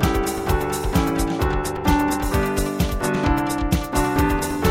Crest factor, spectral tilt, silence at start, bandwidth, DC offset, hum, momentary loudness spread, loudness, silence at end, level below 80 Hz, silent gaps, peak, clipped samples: 16 dB; -5.5 dB/octave; 0 s; 16.5 kHz; under 0.1%; none; 3 LU; -22 LUFS; 0 s; -28 dBFS; none; -4 dBFS; under 0.1%